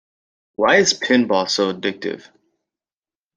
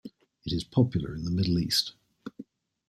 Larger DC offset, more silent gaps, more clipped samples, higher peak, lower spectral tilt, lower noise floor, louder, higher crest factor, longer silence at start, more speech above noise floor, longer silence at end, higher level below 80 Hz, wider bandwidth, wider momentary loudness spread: neither; neither; neither; first, -2 dBFS vs -10 dBFS; second, -3 dB/octave vs -5.5 dB/octave; first, under -90 dBFS vs -50 dBFS; first, -17 LUFS vs -28 LUFS; about the same, 18 dB vs 20 dB; first, 0.6 s vs 0.05 s; first, over 72 dB vs 22 dB; first, 1.2 s vs 0.45 s; second, -64 dBFS vs -52 dBFS; second, 10 kHz vs 14.5 kHz; second, 15 LU vs 21 LU